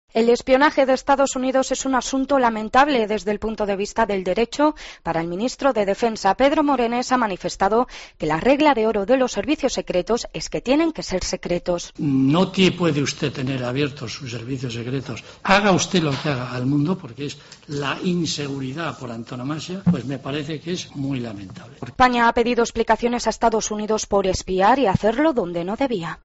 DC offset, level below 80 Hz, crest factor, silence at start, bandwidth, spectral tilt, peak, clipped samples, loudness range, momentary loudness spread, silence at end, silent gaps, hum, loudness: under 0.1%; -44 dBFS; 16 dB; 0.15 s; 8 kHz; -4.5 dB/octave; -4 dBFS; under 0.1%; 6 LU; 12 LU; 0.1 s; none; none; -21 LUFS